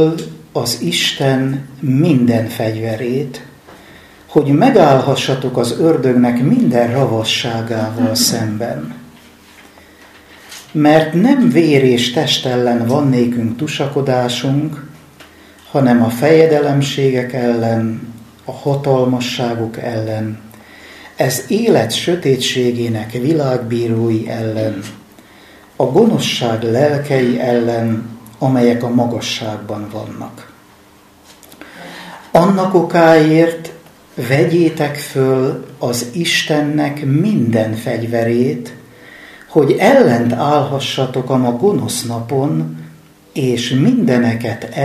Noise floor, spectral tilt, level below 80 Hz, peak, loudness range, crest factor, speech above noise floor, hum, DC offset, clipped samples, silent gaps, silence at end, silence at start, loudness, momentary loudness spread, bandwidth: -45 dBFS; -5.5 dB/octave; -54 dBFS; 0 dBFS; 5 LU; 14 dB; 31 dB; none; under 0.1%; under 0.1%; none; 0 s; 0 s; -14 LUFS; 14 LU; 15.5 kHz